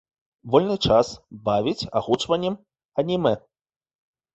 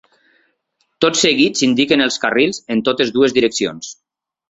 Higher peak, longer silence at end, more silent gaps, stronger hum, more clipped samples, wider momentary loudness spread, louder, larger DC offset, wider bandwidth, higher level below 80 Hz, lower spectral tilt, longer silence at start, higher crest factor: second, -4 dBFS vs 0 dBFS; first, 0.95 s vs 0.55 s; first, 2.85-2.89 s vs none; neither; neither; first, 11 LU vs 8 LU; second, -23 LUFS vs -15 LUFS; neither; about the same, 8.2 kHz vs 8 kHz; first, -50 dBFS vs -56 dBFS; first, -6 dB/octave vs -3 dB/octave; second, 0.45 s vs 1 s; first, 22 dB vs 16 dB